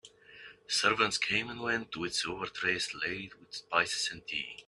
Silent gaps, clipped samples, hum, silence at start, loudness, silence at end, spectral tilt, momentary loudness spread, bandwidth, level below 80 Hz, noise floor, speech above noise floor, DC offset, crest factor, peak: none; under 0.1%; none; 0.05 s; -31 LUFS; 0.05 s; -2 dB/octave; 15 LU; 12 kHz; -68 dBFS; -54 dBFS; 20 dB; under 0.1%; 22 dB; -12 dBFS